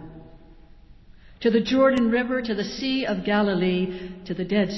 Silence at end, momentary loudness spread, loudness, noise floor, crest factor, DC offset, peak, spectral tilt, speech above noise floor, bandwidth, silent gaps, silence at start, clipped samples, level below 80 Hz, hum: 0 s; 12 LU; -23 LUFS; -48 dBFS; 16 dB; under 0.1%; -8 dBFS; -6.5 dB/octave; 25 dB; 8 kHz; none; 0 s; under 0.1%; -50 dBFS; none